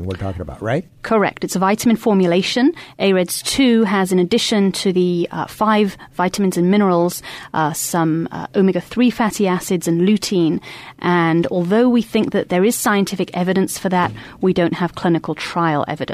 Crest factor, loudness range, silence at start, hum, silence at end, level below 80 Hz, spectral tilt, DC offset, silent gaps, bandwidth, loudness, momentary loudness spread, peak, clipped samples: 12 dB; 2 LU; 0 s; none; 0 s; -50 dBFS; -5 dB/octave; under 0.1%; none; 15.5 kHz; -17 LUFS; 7 LU; -4 dBFS; under 0.1%